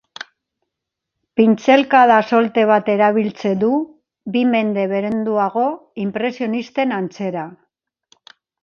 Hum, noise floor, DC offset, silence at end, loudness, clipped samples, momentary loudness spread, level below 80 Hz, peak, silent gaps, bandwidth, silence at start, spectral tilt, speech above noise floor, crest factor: none; -81 dBFS; under 0.1%; 1.1 s; -17 LUFS; under 0.1%; 14 LU; -66 dBFS; 0 dBFS; none; 6.8 kHz; 1.35 s; -6.5 dB/octave; 65 dB; 18 dB